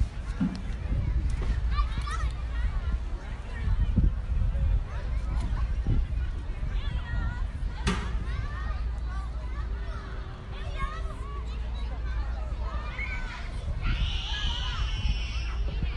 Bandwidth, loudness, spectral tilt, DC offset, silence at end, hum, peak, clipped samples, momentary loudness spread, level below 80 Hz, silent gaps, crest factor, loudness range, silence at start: 10.5 kHz; -33 LUFS; -6 dB/octave; under 0.1%; 0 s; none; -12 dBFS; under 0.1%; 7 LU; -30 dBFS; none; 16 dB; 5 LU; 0 s